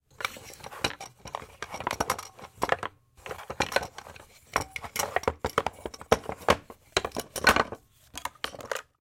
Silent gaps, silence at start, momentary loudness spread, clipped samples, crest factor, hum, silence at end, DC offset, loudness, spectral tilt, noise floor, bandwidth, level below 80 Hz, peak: none; 0.2 s; 16 LU; under 0.1%; 26 dB; none; 0.2 s; under 0.1%; -30 LUFS; -2.5 dB/octave; -50 dBFS; 17 kHz; -50 dBFS; -6 dBFS